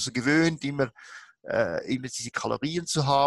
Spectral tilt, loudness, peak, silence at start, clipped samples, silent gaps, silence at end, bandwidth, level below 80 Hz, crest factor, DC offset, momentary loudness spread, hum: -4.5 dB/octave; -27 LUFS; -8 dBFS; 0 s; under 0.1%; none; 0 s; 12.5 kHz; -60 dBFS; 18 dB; under 0.1%; 12 LU; none